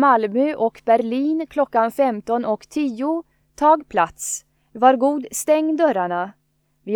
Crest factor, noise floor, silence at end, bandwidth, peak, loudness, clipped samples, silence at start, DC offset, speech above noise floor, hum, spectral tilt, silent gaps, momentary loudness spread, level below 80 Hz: 18 dB; -55 dBFS; 0 s; 19.5 kHz; 0 dBFS; -20 LUFS; under 0.1%; 0 s; under 0.1%; 36 dB; none; -4 dB/octave; none; 10 LU; -60 dBFS